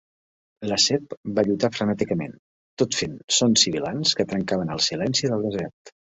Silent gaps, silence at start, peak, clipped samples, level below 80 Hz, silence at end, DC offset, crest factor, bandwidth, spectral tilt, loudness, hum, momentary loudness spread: 1.17-1.24 s, 2.39-2.77 s, 3.24-3.28 s, 5.73-5.85 s; 0.6 s; -4 dBFS; under 0.1%; -56 dBFS; 0.25 s; under 0.1%; 20 dB; 8.4 kHz; -3.5 dB/octave; -22 LUFS; none; 10 LU